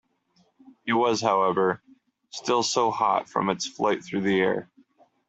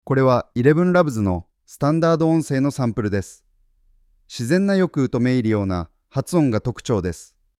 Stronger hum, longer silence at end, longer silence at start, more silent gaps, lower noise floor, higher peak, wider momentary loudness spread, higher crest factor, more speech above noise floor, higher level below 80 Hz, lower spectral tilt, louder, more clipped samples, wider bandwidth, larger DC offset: neither; first, 0.65 s vs 0.35 s; first, 0.85 s vs 0.05 s; neither; first, -66 dBFS vs -59 dBFS; second, -8 dBFS vs -2 dBFS; about the same, 10 LU vs 11 LU; about the same, 18 dB vs 18 dB; about the same, 42 dB vs 40 dB; second, -68 dBFS vs -48 dBFS; second, -4 dB/octave vs -7 dB/octave; second, -25 LUFS vs -20 LUFS; neither; second, 8.2 kHz vs 14.5 kHz; neither